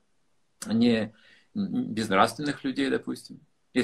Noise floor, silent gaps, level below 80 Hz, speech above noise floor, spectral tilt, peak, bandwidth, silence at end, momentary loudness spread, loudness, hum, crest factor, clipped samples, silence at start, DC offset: -75 dBFS; none; -62 dBFS; 48 dB; -5 dB/octave; -4 dBFS; 13 kHz; 0 s; 15 LU; -27 LUFS; none; 24 dB; under 0.1%; 0.6 s; under 0.1%